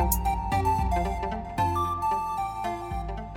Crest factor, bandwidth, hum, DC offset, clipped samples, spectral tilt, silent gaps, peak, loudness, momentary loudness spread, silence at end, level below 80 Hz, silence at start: 20 dB; 17 kHz; none; under 0.1%; under 0.1%; -5.5 dB/octave; none; -8 dBFS; -28 LUFS; 7 LU; 0 s; -34 dBFS; 0 s